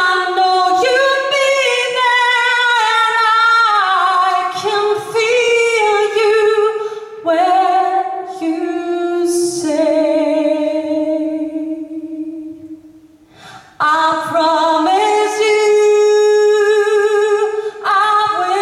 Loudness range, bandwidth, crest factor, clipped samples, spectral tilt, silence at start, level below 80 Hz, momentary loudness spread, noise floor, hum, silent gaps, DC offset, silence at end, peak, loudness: 7 LU; 13 kHz; 12 dB; under 0.1%; -2 dB/octave; 0 s; -62 dBFS; 10 LU; -44 dBFS; none; none; under 0.1%; 0 s; -2 dBFS; -13 LUFS